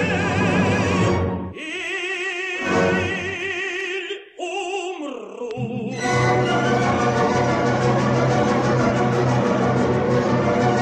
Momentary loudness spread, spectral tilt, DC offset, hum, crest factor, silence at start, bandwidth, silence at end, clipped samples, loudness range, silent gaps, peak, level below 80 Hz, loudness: 9 LU; -6 dB/octave; under 0.1%; none; 14 dB; 0 s; 9.4 kHz; 0 s; under 0.1%; 5 LU; none; -6 dBFS; -46 dBFS; -21 LUFS